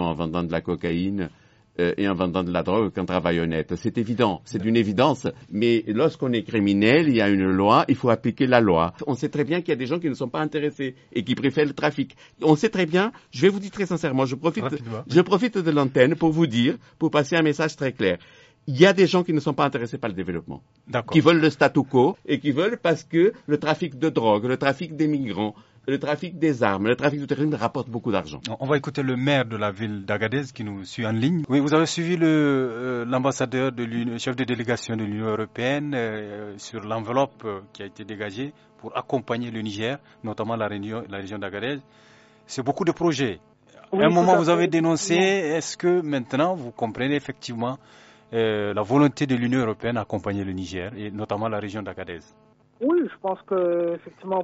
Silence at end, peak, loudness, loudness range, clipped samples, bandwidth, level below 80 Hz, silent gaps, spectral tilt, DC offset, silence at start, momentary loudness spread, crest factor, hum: 0 s; -2 dBFS; -23 LUFS; 8 LU; under 0.1%; 8 kHz; -58 dBFS; none; -5 dB/octave; under 0.1%; 0 s; 13 LU; 20 dB; none